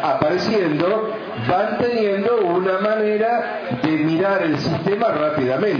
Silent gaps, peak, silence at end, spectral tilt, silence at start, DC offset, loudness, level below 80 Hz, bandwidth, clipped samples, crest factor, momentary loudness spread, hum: none; 0 dBFS; 0 s; -7 dB/octave; 0 s; under 0.1%; -19 LUFS; -58 dBFS; 5.4 kHz; under 0.1%; 18 dB; 4 LU; none